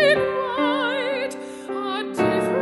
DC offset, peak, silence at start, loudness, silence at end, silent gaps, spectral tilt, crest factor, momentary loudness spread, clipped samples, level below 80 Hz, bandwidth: under 0.1%; -6 dBFS; 0 s; -23 LUFS; 0 s; none; -5 dB/octave; 16 dB; 9 LU; under 0.1%; -58 dBFS; 11.5 kHz